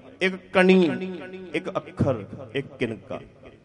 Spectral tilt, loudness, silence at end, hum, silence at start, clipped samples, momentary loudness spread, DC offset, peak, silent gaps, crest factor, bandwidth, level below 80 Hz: -7 dB/octave; -24 LUFS; 0.15 s; none; 0.05 s; under 0.1%; 18 LU; under 0.1%; -4 dBFS; none; 20 dB; 10 kHz; -54 dBFS